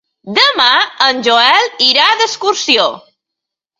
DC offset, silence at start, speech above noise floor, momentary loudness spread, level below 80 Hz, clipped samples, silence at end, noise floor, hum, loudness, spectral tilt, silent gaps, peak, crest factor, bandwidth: under 0.1%; 0.25 s; 69 dB; 6 LU; -64 dBFS; under 0.1%; 0.8 s; -81 dBFS; none; -10 LUFS; -1 dB/octave; none; 0 dBFS; 12 dB; 16 kHz